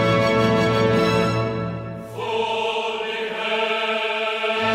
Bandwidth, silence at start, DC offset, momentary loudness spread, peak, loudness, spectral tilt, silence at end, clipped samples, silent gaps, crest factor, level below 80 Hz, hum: 15.5 kHz; 0 s; under 0.1%; 9 LU; -6 dBFS; -21 LUFS; -5.5 dB/octave; 0 s; under 0.1%; none; 14 dB; -48 dBFS; none